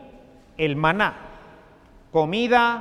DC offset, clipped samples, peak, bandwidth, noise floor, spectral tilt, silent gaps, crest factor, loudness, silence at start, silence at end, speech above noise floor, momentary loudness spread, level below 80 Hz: under 0.1%; under 0.1%; -4 dBFS; 12 kHz; -51 dBFS; -6 dB/octave; none; 20 dB; -22 LUFS; 0 s; 0 s; 30 dB; 14 LU; -50 dBFS